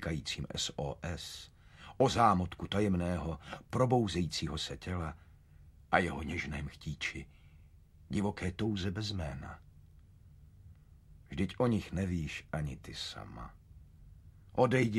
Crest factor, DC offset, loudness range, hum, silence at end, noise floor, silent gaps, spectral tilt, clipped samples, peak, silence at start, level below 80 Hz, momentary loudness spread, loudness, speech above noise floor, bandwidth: 26 dB; under 0.1%; 7 LU; none; 0 s; -59 dBFS; none; -5.5 dB/octave; under 0.1%; -10 dBFS; 0 s; -52 dBFS; 17 LU; -35 LUFS; 25 dB; 14 kHz